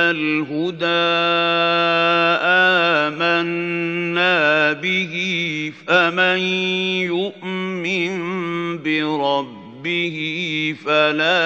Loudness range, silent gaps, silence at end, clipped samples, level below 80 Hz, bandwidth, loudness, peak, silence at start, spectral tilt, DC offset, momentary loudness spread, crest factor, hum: 6 LU; none; 0 s; under 0.1%; -74 dBFS; 8 kHz; -18 LUFS; 0 dBFS; 0 s; -5 dB/octave; under 0.1%; 9 LU; 18 dB; none